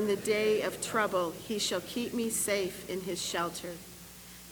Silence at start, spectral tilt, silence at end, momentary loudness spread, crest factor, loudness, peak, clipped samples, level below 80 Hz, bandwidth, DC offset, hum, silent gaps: 0 s; -3 dB/octave; 0 s; 16 LU; 18 dB; -32 LUFS; -16 dBFS; under 0.1%; -62 dBFS; over 20 kHz; under 0.1%; none; none